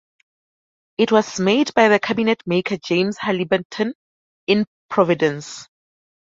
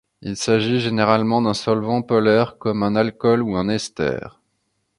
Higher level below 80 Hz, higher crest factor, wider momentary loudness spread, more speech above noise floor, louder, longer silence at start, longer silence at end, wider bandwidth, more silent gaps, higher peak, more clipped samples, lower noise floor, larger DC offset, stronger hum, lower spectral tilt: second, -62 dBFS vs -52 dBFS; about the same, 18 dB vs 20 dB; first, 12 LU vs 7 LU; first, over 72 dB vs 52 dB; about the same, -19 LUFS vs -19 LUFS; first, 1 s vs 0.2 s; second, 0.55 s vs 0.7 s; second, 7.8 kHz vs 11.5 kHz; first, 3.65-3.70 s, 3.95-4.47 s, 4.67-4.89 s vs none; about the same, -2 dBFS vs 0 dBFS; neither; first, under -90 dBFS vs -71 dBFS; neither; neither; about the same, -5 dB/octave vs -5.5 dB/octave